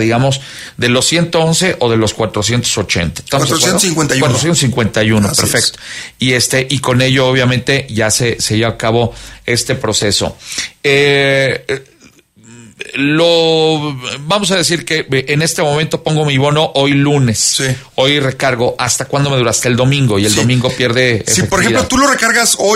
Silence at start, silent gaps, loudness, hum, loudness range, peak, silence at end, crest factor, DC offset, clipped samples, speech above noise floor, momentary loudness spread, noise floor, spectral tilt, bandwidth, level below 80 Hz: 0 s; none; -12 LUFS; none; 2 LU; 0 dBFS; 0 s; 12 dB; under 0.1%; under 0.1%; 32 dB; 6 LU; -45 dBFS; -3.5 dB/octave; 16 kHz; -40 dBFS